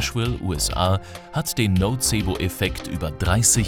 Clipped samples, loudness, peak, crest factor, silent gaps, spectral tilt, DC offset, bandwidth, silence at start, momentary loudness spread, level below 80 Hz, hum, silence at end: under 0.1%; -22 LUFS; -4 dBFS; 18 dB; none; -4 dB/octave; under 0.1%; 18.5 kHz; 0 s; 8 LU; -34 dBFS; none; 0 s